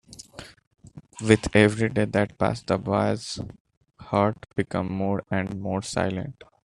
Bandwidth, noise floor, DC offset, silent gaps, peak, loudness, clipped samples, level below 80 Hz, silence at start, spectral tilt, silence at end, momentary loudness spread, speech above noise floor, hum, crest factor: 11.5 kHz; -45 dBFS; under 0.1%; 0.67-0.71 s, 3.60-3.65 s, 3.77-3.81 s; -2 dBFS; -25 LUFS; under 0.1%; -52 dBFS; 0.1 s; -6 dB/octave; 0.35 s; 20 LU; 21 dB; none; 24 dB